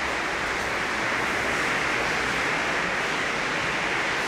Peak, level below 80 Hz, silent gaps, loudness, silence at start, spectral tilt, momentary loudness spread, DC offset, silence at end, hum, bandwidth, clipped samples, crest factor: -14 dBFS; -48 dBFS; none; -24 LUFS; 0 s; -2.5 dB/octave; 2 LU; under 0.1%; 0 s; none; 16 kHz; under 0.1%; 12 dB